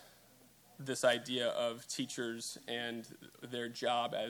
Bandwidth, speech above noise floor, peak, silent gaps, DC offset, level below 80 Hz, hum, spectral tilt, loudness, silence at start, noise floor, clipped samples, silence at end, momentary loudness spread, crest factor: 19.5 kHz; 26 dB; -18 dBFS; none; under 0.1%; -84 dBFS; none; -3 dB/octave; -37 LUFS; 0 s; -64 dBFS; under 0.1%; 0 s; 14 LU; 20 dB